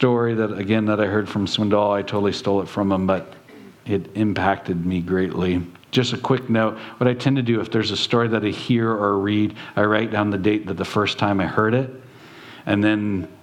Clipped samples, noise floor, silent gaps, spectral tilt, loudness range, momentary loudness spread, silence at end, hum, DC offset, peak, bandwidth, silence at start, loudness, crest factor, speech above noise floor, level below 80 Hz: under 0.1%; -42 dBFS; none; -6.5 dB/octave; 2 LU; 5 LU; 0.05 s; none; under 0.1%; -2 dBFS; 11.5 kHz; 0 s; -21 LUFS; 18 dB; 22 dB; -56 dBFS